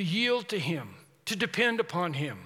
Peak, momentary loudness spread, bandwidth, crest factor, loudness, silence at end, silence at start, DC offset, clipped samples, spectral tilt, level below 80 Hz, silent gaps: -12 dBFS; 10 LU; 16.5 kHz; 18 dB; -29 LUFS; 0 s; 0 s; under 0.1%; under 0.1%; -4.5 dB/octave; -78 dBFS; none